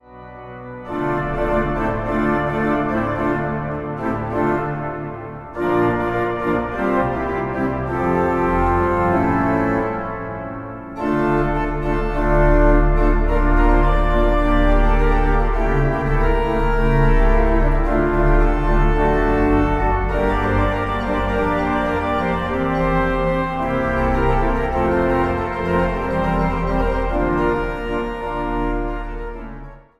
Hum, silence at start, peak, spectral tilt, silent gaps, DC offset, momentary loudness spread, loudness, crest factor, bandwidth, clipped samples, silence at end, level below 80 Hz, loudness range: none; 0.1 s; -2 dBFS; -8.5 dB/octave; none; under 0.1%; 8 LU; -19 LUFS; 14 dB; 6 kHz; under 0.1%; 0.2 s; -22 dBFS; 4 LU